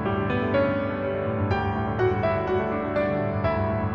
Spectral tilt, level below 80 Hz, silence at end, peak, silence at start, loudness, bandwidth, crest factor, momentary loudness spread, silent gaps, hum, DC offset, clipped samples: -9.5 dB/octave; -42 dBFS; 0 s; -12 dBFS; 0 s; -25 LUFS; 6 kHz; 14 dB; 3 LU; none; none; under 0.1%; under 0.1%